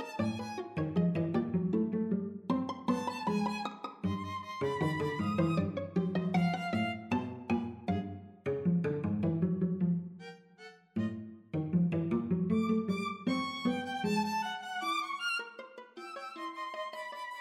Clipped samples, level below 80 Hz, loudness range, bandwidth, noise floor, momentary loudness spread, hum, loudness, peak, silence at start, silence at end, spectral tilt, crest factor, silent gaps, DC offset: under 0.1%; -68 dBFS; 2 LU; 12.5 kHz; -55 dBFS; 10 LU; none; -34 LUFS; -16 dBFS; 0 s; 0 s; -7 dB/octave; 16 dB; none; under 0.1%